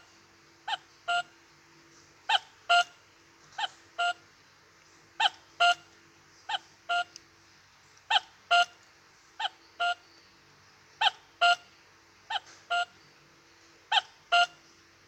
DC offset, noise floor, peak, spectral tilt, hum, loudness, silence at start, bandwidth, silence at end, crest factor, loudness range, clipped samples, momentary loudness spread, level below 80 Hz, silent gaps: under 0.1%; -60 dBFS; -12 dBFS; 0.5 dB/octave; none; -29 LUFS; 0.65 s; 9 kHz; 0.6 s; 22 dB; 1 LU; under 0.1%; 12 LU; -80 dBFS; none